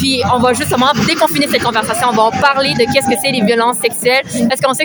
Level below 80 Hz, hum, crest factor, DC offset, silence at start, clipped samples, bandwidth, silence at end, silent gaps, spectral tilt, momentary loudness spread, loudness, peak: -46 dBFS; none; 12 dB; under 0.1%; 0 s; under 0.1%; over 20 kHz; 0 s; none; -3.5 dB/octave; 2 LU; -12 LUFS; 0 dBFS